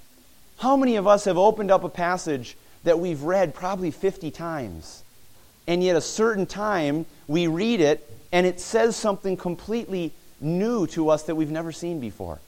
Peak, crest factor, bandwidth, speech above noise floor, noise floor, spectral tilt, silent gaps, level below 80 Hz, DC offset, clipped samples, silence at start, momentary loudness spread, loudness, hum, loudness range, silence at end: -4 dBFS; 20 dB; 17 kHz; 29 dB; -52 dBFS; -5.5 dB/octave; none; -52 dBFS; under 0.1%; under 0.1%; 0 s; 11 LU; -24 LUFS; none; 4 LU; 0.05 s